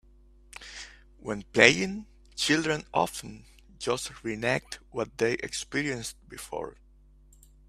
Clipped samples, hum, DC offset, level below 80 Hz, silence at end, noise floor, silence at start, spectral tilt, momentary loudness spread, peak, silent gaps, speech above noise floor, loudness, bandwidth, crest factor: under 0.1%; none; under 0.1%; -56 dBFS; 0.95 s; -57 dBFS; 0.55 s; -3.5 dB/octave; 23 LU; 0 dBFS; none; 28 dB; -28 LUFS; 15 kHz; 30 dB